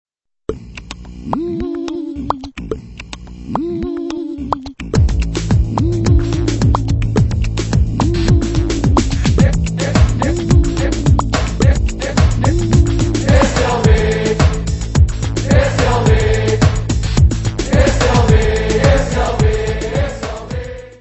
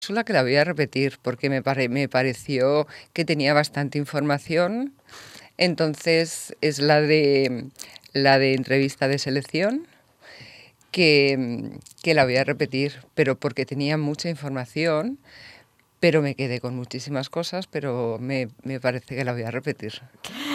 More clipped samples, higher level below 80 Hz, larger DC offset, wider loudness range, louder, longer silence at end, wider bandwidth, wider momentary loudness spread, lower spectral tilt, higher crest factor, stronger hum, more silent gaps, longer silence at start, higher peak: neither; first, -18 dBFS vs -66 dBFS; neither; first, 9 LU vs 5 LU; first, -15 LUFS vs -23 LUFS; about the same, 0.05 s vs 0 s; second, 8.4 kHz vs 15 kHz; about the same, 12 LU vs 13 LU; about the same, -6 dB/octave vs -5.5 dB/octave; second, 14 dB vs 22 dB; neither; neither; first, 0.5 s vs 0 s; about the same, 0 dBFS vs -2 dBFS